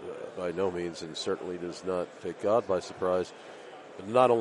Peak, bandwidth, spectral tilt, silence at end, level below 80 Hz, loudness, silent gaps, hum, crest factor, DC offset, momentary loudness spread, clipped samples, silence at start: -8 dBFS; 11.5 kHz; -5.5 dB/octave; 0 s; -70 dBFS; -31 LUFS; none; none; 22 dB; under 0.1%; 17 LU; under 0.1%; 0 s